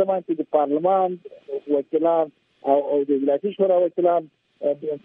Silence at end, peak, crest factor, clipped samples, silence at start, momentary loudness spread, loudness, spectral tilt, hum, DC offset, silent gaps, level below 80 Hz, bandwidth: 0.05 s; -6 dBFS; 16 dB; under 0.1%; 0 s; 9 LU; -22 LUFS; -10.5 dB/octave; none; under 0.1%; none; -78 dBFS; 3.7 kHz